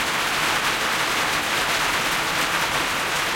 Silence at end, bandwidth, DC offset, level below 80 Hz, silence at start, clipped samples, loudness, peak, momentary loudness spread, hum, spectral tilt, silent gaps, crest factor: 0 s; 16.5 kHz; under 0.1%; -48 dBFS; 0 s; under 0.1%; -21 LUFS; -8 dBFS; 1 LU; none; -1 dB/octave; none; 14 dB